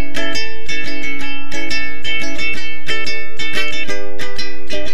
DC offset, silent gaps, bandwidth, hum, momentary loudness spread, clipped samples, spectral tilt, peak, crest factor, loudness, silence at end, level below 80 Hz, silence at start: 50%; none; 17 kHz; none; 6 LU; under 0.1%; -3.5 dB/octave; 0 dBFS; 16 dB; -22 LUFS; 0 s; -42 dBFS; 0 s